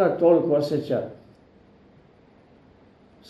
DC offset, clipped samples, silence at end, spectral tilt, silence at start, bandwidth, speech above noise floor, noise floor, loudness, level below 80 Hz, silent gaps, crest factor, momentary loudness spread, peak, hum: under 0.1%; under 0.1%; 2.15 s; -8 dB/octave; 0 s; 12.5 kHz; 33 dB; -55 dBFS; -22 LUFS; -66 dBFS; none; 18 dB; 10 LU; -6 dBFS; none